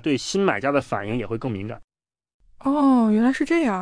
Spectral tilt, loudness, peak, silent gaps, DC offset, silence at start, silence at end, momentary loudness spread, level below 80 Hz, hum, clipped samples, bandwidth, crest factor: -6 dB/octave; -22 LUFS; -6 dBFS; 1.84-1.88 s, 2.34-2.40 s; under 0.1%; 0.05 s; 0 s; 12 LU; -52 dBFS; none; under 0.1%; 10.5 kHz; 16 dB